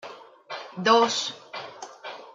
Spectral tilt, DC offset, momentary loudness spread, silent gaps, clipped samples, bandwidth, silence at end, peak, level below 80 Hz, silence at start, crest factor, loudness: -2.5 dB/octave; under 0.1%; 20 LU; none; under 0.1%; 9.4 kHz; 0.05 s; -8 dBFS; -82 dBFS; 0.05 s; 20 dB; -23 LUFS